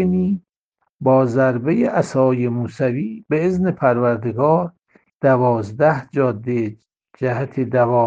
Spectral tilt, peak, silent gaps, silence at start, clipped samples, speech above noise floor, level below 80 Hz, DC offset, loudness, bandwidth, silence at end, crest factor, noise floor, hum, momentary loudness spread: -9 dB/octave; -2 dBFS; 0.58-0.72 s, 0.92-0.99 s, 5.14-5.20 s; 0 s; under 0.1%; 55 dB; -56 dBFS; under 0.1%; -19 LUFS; 9.2 kHz; 0 s; 16 dB; -72 dBFS; none; 7 LU